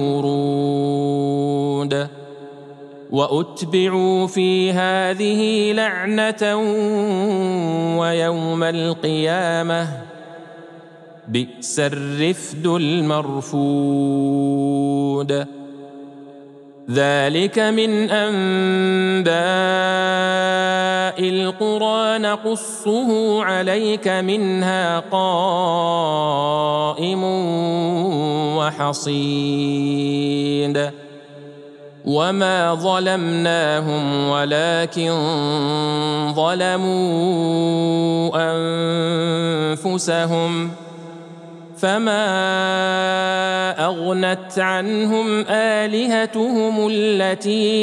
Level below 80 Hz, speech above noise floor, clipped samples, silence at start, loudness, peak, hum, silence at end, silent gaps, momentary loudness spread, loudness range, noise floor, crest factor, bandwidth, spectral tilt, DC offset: -76 dBFS; 24 dB; under 0.1%; 0 s; -19 LUFS; -4 dBFS; none; 0 s; none; 6 LU; 4 LU; -42 dBFS; 16 dB; 12 kHz; -5 dB/octave; under 0.1%